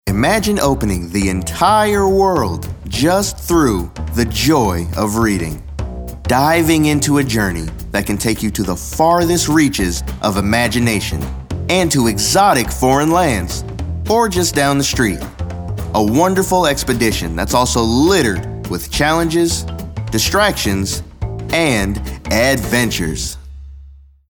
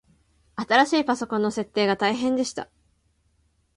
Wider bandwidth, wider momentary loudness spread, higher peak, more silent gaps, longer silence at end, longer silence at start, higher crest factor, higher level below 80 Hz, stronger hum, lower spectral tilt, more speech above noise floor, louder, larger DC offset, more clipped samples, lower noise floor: first, over 20 kHz vs 11.5 kHz; second, 12 LU vs 17 LU; about the same, 0 dBFS vs -2 dBFS; neither; second, 0.3 s vs 1.1 s; second, 0.05 s vs 0.55 s; second, 14 dB vs 22 dB; first, -30 dBFS vs -62 dBFS; neither; about the same, -4.5 dB/octave vs -4 dB/octave; second, 25 dB vs 44 dB; first, -15 LUFS vs -23 LUFS; neither; neither; second, -40 dBFS vs -67 dBFS